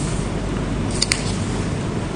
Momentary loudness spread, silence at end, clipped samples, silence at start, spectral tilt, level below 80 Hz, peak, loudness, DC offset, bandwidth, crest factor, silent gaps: 5 LU; 0 s; under 0.1%; 0 s; -4.5 dB/octave; -30 dBFS; 0 dBFS; -22 LUFS; under 0.1%; 10 kHz; 22 dB; none